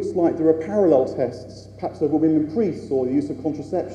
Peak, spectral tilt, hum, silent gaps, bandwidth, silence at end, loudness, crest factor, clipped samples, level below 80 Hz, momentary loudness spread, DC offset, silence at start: -4 dBFS; -8.5 dB/octave; none; none; 9 kHz; 0 s; -21 LUFS; 18 dB; under 0.1%; -54 dBFS; 12 LU; under 0.1%; 0 s